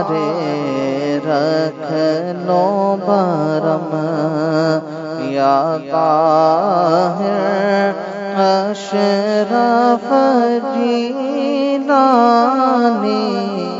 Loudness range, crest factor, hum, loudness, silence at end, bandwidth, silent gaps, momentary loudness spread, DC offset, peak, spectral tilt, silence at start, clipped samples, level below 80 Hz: 3 LU; 14 dB; none; -15 LUFS; 0 s; 7.8 kHz; none; 7 LU; under 0.1%; 0 dBFS; -6.5 dB/octave; 0 s; under 0.1%; -68 dBFS